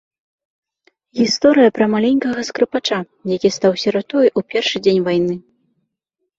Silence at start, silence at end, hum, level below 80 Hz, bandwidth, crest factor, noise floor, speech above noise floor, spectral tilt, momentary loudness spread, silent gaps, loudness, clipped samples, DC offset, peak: 1.15 s; 1 s; none; -58 dBFS; 8 kHz; 16 dB; -76 dBFS; 60 dB; -5 dB/octave; 9 LU; none; -16 LUFS; under 0.1%; under 0.1%; -2 dBFS